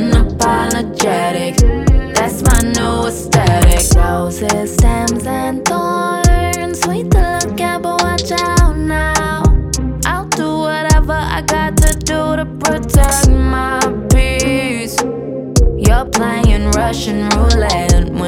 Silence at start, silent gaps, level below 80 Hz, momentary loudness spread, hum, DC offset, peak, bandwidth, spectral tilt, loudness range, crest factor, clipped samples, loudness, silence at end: 0 s; none; -16 dBFS; 5 LU; none; under 0.1%; 0 dBFS; 17.5 kHz; -5 dB/octave; 2 LU; 12 dB; under 0.1%; -14 LUFS; 0 s